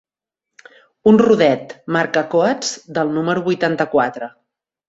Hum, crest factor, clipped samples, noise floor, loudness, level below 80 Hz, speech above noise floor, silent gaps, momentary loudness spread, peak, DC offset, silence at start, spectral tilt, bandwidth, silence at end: none; 16 dB; under 0.1%; -83 dBFS; -17 LUFS; -58 dBFS; 67 dB; none; 10 LU; -2 dBFS; under 0.1%; 1.05 s; -5 dB/octave; 8 kHz; 0.6 s